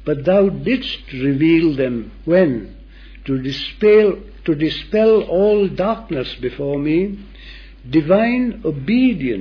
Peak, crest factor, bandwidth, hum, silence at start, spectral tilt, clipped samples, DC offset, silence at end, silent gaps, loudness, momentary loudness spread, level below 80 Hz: -2 dBFS; 14 dB; 5.4 kHz; none; 0 s; -8.5 dB/octave; under 0.1%; under 0.1%; 0 s; none; -17 LUFS; 11 LU; -40 dBFS